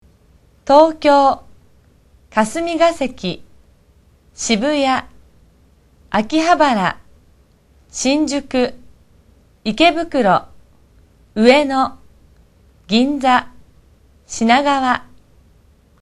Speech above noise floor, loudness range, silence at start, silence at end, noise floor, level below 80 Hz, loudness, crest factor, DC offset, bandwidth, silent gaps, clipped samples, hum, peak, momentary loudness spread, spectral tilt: 37 dB; 4 LU; 0.65 s; 0.95 s; -52 dBFS; -48 dBFS; -16 LUFS; 18 dB; under 0.1%; 12 kHz; none; under 0.1%; none; 0 dBFS; 14 LU; -4 dB/octave